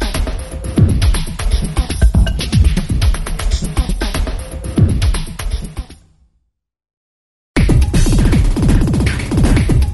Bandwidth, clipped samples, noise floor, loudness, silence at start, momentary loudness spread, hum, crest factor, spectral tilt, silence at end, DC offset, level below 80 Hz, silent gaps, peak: 12 kHz; under 0.1%; -66 dBFS; -16 LUFS; 0 s; 11 LU; none; 14 dB; -6 dB/octave; 0 s; under 0.1%; -16 dBFS; 6.97-7.54 s; 0 dBFS